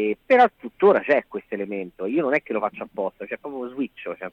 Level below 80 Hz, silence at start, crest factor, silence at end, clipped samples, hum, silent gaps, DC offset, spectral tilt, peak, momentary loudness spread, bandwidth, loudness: -66 dBFS; 0 s; 18 dB; 0.05 s; under 0.1%; none; none; under 0.1%; -7.5 dB/octave; -6 dBFS; 15 LU; 6.6 kHz; -23 LUFS